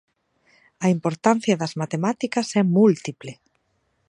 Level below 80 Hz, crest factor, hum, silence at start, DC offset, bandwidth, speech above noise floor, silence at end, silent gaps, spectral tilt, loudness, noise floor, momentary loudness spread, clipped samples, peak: -70 dBFS; 20 dB; none; 0.8 s; under 0.1%; 10.5 kHz; 49 dB; 0.75 s; none; -6 dB/octave; -21 LUFS; -70 dBFS; 12 LU; under 0.1%; -2 dBFS